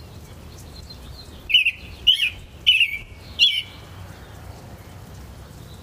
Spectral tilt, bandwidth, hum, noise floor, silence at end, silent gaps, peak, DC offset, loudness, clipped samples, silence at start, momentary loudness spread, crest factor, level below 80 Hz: -1.5 dB/octave; 15.5 kHz; none; -40 dBFS; 0 s; none; -4 dBFS; under 0.1%; -18 LUFS; under 0.1%; 0 s; 25 LU; 22 dB; -46 dBFS